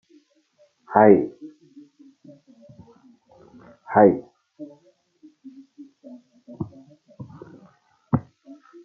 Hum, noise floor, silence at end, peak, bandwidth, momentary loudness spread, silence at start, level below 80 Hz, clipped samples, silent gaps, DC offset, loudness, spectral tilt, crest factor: none; -62 dBFS; 0.65 s; -2 dBFS; 2.9 kHz; 29 LU; 0.9 s; -64 dBFS; under 0.1%; none; under 0.1%; -19 LUFS; -11 dB/octave; 24 dB